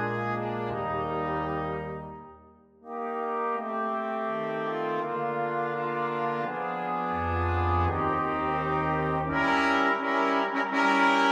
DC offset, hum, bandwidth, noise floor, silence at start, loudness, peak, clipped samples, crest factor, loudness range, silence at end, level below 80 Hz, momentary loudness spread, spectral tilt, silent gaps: under 0.1%; none; 10.5 kHz; -55 dBFS; 0 s; -28 LUFS; -10 dBFS; under 0.1%; 18 dB; 7 LU; 0 s; -48 dBFS; 8 LU; -6.5 dB/octave; none